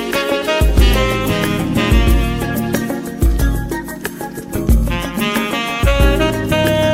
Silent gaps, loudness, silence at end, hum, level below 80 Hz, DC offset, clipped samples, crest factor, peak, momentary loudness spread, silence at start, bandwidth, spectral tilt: none; -16 LUFS; 0 s; none; -18 dBFS; under 0.1%; under 0.1%; 14 dB; 0 dBFS; 9 LU; 0 s; 16.5 kHz; -5.5 dB/octave